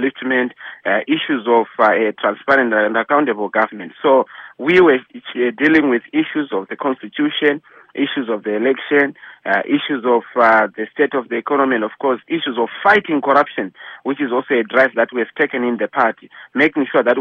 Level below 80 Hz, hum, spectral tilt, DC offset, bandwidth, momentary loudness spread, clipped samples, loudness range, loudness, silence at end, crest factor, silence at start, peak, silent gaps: -62 dBFS; none; -6.5 dB/octave; under 0.1%; 6.4 kHz; 9 LU; under 0.1%; 3 LU; -17 LUFS; 0 s; 16 dB; 0 s; -2 dBFS; none